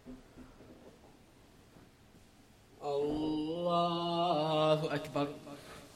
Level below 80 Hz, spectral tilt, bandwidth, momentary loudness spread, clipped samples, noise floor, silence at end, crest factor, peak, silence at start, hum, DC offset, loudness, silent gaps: -64 dBFS; -6.5 dB/octave; 15 kHz; 24 LU; under 0.1%; -61 dBFS; 0 s; 20 dB; -18 dBFS; 0.05 s; none; under 0.1%; -33 LUFS; none